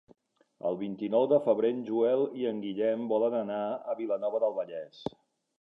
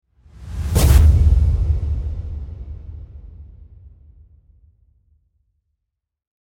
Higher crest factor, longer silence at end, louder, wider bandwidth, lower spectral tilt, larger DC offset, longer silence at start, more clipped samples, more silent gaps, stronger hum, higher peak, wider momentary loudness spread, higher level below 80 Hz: about the same, 18 dB vs 18 dB; second, 0.5 s vs 3.1 s; second, -30 LUFS vs -17 LUFS; second, 5.6 kHz vs 17 kHz; first, -8.5 dB/octave vs -6 dB/octave; neither; first, 0.65 s vs 0.4 s; neither; neither; neither; second, -12 dBFS vs -2 dBFS; second, 12 LU vs 26 LU; second, -76 dBFS vs -22 dBFS